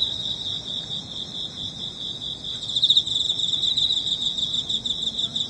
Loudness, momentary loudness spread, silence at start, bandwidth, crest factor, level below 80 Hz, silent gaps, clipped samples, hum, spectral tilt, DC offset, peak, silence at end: -22 LUFS; 12 LU; 0 s; 10.5 kHz; 20 dB; -54 dBFS; none; under 0.1%; none; -1.5 dB/octave; under 0.1%; -6 dBFS; 0 s